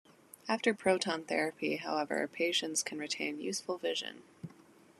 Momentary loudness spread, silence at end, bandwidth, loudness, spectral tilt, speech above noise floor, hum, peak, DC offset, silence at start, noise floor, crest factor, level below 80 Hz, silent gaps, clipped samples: 16 LU; 0.5 s; 13.5 kHz; -34 LUFS; -2.5 dB/octave; 26 dB; none; -14 dBFS; under 0.1%; 0.45 s; -60 dBFS; 22 dB; -82 dBFS; none; under 0.1%